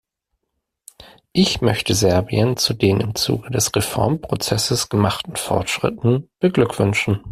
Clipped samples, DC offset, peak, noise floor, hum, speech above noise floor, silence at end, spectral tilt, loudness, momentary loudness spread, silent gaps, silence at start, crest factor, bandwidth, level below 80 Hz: under 0.1%; under 0.1%; -2 dBFS; -77 dBFS; none; 58 dB; 0 s; -4.5 dB/octave; -19 LUFS; 4 LU; none; 1 s; 16 dB; 15.5 kHz; -46 dBFS